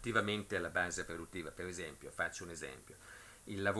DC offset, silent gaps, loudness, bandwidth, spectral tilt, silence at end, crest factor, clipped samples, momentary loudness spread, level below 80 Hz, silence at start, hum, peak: under 0.1%; none; -40 LUFS; 11 kHz; -4 dB/octave; 0 s; 24 dB; under 0.1%; 17 LU; -64 dBFS; 0 s; none; -18 dBFS